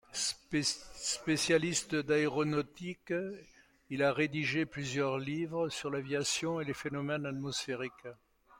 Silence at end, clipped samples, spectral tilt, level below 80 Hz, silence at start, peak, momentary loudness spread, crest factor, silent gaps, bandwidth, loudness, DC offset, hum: 0.45 s; under 0.1%; -4 dB/octave; -66 dBFS; 0.1 s; -16 dBFS; 10 LU; 18 dB; none; 16.5 kHz; -34 LUFS; under 0.1%; none